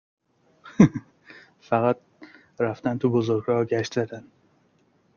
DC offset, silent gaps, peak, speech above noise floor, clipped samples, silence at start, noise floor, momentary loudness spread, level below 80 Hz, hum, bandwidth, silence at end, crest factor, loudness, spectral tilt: under 0.1%; none; -2 dBFS; 41 dB; under 0.1%; 0.65 s; -64 dBFS; 14 LU; -60 dBFS; none; 7.2 kHz; 0.95 s; 24 dB; -24 LUFS; -7.5 dB/octave